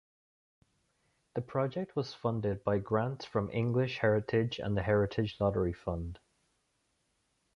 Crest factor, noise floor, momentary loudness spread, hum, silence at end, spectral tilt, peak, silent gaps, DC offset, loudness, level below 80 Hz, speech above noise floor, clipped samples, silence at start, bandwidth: 20 dB; -78 dBFS; 8 LU; none; 1.4 s; -8 dB/octave; -14 dBFS; none; under 0.1%; -33 LUFS; -54 dBFS; 46 dB; under 0.1%; 1.35 s; 7 kHz